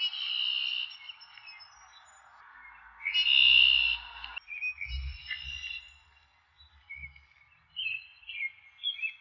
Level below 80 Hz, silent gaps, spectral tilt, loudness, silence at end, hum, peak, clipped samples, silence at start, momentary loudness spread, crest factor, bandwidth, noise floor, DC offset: -52 dBFS; none; 0 dB/octave; -27 LUFS; 0.05 s; none; -12 dBFS; under 0.1%; 0 s; 26 LU; 22 dB; 7.4 kHz; -65 dBFS; under 0.1%